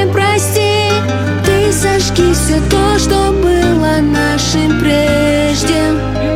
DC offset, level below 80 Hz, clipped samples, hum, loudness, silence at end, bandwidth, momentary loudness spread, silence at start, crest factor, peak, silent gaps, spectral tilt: under 0.1%; -22 dBFS; under 0.1%; none; -12 LUFS; 0 s; 16.5 kHz; 2 LU; 0 s; 10 dB; 0 dBFS; none; -5 dB/octave